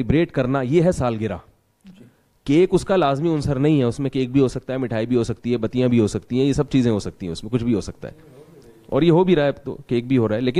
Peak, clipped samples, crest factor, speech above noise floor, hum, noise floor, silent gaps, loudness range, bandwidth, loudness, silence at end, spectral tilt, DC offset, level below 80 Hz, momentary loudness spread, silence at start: -4 dBFS; under 0.1%; 16 dB; 32 dB; none; -51 dBFS; none; 2 LU; 11.5 kHz; -20 LUFS; 0 s; -7.5 dB/octave; under 0.1%; -42 dBFS; 10 LU; 0 s